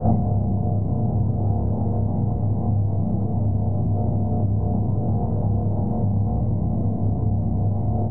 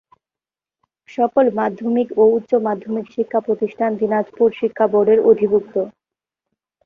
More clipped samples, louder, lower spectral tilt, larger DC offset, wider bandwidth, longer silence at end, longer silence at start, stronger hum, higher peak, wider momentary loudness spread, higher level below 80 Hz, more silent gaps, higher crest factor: neither; second, -23 LUFS vs -18 LUFS; first, -17.5 dB/octave vs -9 dB/octave; first, 2% vs under 0.1%; second, 1.4 kHz vs 3.8 kHz; second, 0 s vs 0.95 s; second, 0 s vs 1.1 s; neither; second, -8 dBFS vs -2 dBFS; second, 1 LU vs 10 LU; first, -32 dBFS vs -64 dBFS; neither; about the same, 14 dB vs 16 dB